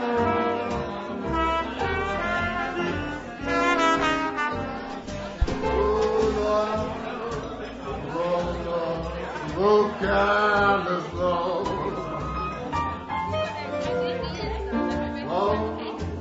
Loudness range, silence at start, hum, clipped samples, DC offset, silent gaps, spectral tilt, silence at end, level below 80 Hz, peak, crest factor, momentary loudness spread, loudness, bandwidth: 5 LU; 0 s; none; under 0.1%; under 0.1%; none; -6 dB/octave; 0 s; -40 dBFS; -8 dBFS; 16 dB; 11 LU; -26 LUFS; 8 kHz